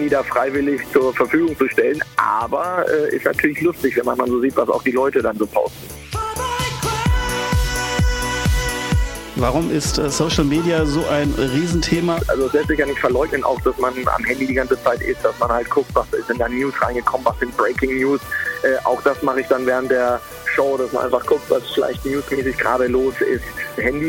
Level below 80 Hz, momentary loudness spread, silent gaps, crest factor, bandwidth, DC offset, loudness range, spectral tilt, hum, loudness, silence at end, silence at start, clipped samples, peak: -30 dBFS; 4 LU; none; 18 dB; 17 kHz; under 0.1%; 2 LU; -5 dB/octave; none; -19 LUFS; 0 s; 0 s; under 0.1%; -2 dBFS